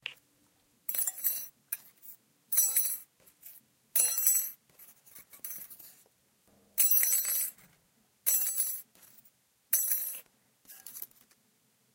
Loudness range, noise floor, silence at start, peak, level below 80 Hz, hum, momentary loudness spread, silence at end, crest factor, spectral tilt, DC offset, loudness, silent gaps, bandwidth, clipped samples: 3 LU; -71 dBFS; 0.05 s; -8 dBFS; -88 dBFS; none; 22 LU; 0.9 s; 26 dB; 3 dB/octave; under 0.1%; -28 LUFS; none; 17 kHz; under 0.1%